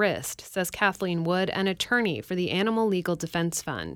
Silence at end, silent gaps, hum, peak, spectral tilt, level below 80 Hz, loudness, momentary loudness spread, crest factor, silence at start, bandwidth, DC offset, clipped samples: 0 s; none; none; -10 dBFS; -4.5 dB/octave; -58 dBFS; -27 LUFS; 6 LU; 18 dB; 0 s; 18 kHz; under 0.1%; under 0.1%